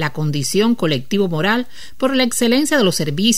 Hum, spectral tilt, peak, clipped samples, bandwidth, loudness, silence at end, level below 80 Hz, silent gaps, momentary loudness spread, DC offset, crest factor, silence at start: none; -4 dB/octave; -2 dBFS; under 0.1%; 16 kHz; -17 LUFS; 0 s; -52 dBFS; none; 6 LU; 4%; 16 dB; 0 s